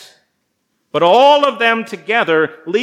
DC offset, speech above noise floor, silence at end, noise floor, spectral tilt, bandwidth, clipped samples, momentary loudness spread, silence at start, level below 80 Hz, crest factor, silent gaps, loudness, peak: under 0.1%; 55 dB; 0 s; -68 dBFS; -4.5 dB/octave; 12.5 kHz; under 0.1%; 9 LU; 0.95 s; -80 dBFS; 14 dB; none; -13 LUFS; 0 dBFS